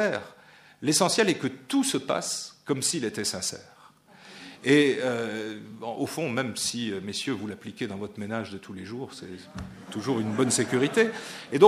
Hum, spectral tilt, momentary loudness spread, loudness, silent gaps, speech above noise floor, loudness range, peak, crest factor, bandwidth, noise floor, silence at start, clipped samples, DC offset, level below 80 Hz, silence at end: none; -3.5 dB/octave; 17 LU; -27 LUFS; none; 27 dB; 7 LU; -2 dBFS; 24 dB; 15.5 kHz; -54 dBFS; 0 s; under 0.1%; under 0.1%; -64 dBFS; 0 s